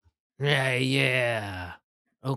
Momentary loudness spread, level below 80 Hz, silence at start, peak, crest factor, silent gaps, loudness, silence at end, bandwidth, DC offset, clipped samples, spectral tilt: 15 LU; -68 dBFS; 0.4 s; -8 dBFS; 20 dB; 1.84-2.05 s; -25 LUFS; 0 s; 13.5 kHz; under 0.1%; under 0.1%; -5 dB/octave